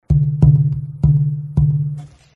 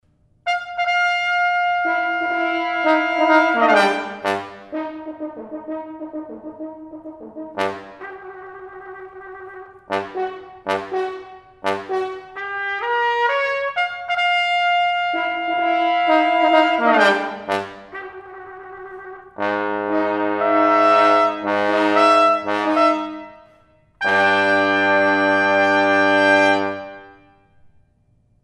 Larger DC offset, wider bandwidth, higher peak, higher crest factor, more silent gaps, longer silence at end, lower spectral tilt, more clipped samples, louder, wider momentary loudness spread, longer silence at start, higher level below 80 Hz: neither; second, 1.5 kHz vs 11.5 kHz; about the same, 0 dBFS vs 0 dBFS; about the same, 16 dB vs 20 dB; neither; second, 0.3 s vs 1.35 s; first, -12 dB/octave vs -4 dB/octave; neither; about the same, -16 LUFS vs -18 LUFS; second, 9 LU vs 21 LU; second, 0.1 s vs 0.45 s; first, -28 dBFS vs -64 dBFS